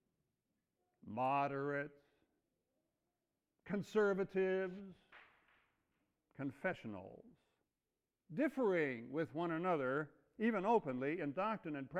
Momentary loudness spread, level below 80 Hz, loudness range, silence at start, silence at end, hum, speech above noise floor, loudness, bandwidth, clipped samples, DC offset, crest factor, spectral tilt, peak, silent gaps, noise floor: 14 LU; -80 dBFS; 9 LU; 1.05 s; 0 s; none; over 51 dB; -40 LUFS; 11 kHz; under 0.1%; under 0.1%; 20 dB; -7.5 dB/octave; -22 dBFS; none; under -90 dBFS